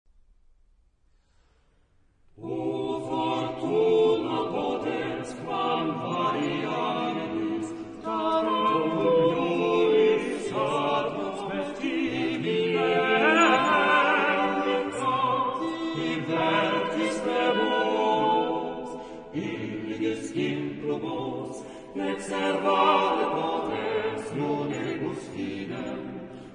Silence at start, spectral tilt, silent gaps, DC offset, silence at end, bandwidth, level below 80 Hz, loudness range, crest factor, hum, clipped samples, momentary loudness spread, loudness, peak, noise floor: 2.4 s; -5 dB/octave; none; under 0.1%; 0 s; 10.5 kHz; -62 dBFS; 8 LU; 18 dB; none; under 0.1%; 13 LU; -26 LUFS; -10 dBFS; -64 dBFS